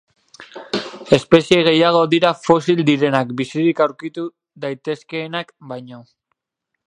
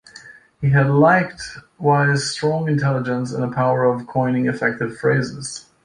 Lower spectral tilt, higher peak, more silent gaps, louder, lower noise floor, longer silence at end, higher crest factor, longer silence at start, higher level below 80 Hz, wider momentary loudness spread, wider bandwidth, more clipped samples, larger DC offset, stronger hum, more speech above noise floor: about the same, -6 dB/octave vs -6 dB/octave; about the same, 0 dBFS vs -2 dBFS; neither; about the same, -17 LUFS vs -19 LUFS; first, -79 dBFS vs -44 dBFS; first, 0.85 s vs 0.25 s; about the same, 18 dB vs 16 dB; first, 0.4 s vs 0.15 s; about the same, -58 dBFS vs -54 dBFS; first, 18 LU vs 12 LU; about the same, 10.5 kHz vs 10.5 kHz; neither; neither; neither; first, 62 dB vs 25 dB